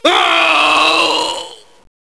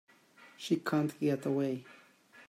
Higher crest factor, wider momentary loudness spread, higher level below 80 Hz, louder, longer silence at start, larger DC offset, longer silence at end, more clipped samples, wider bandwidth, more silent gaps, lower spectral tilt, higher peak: about the same, 14 dB vs 18 dB; first, 13 LU vs 9 LU; first, -54 dBFS vs -84 dBFS; first, -11 LUFS vs -33 LUFS; second, 0.05 s vs 0.4 s; first, 0.4% vs under 0.1%; first, 0.55 s vs 0.05 s; neither; second, 11 kHz vs 16 kHz; neither; second, -0.5 dB/octave vs -6.5 dB/octave; first, 0 dBFS vs -16 dBFS